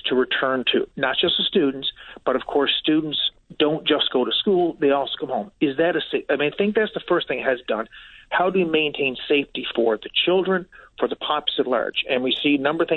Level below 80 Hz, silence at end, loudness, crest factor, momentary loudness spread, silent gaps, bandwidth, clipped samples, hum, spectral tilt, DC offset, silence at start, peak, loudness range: -58 dBFS; 0 s; -22 LUFS; 16 dB; 7 LU; none; 4.4 kHz; under 0.1%; none; -7.5 dB/octave; under 0.1%; 0.05 s; -6 dBFS; 2 LU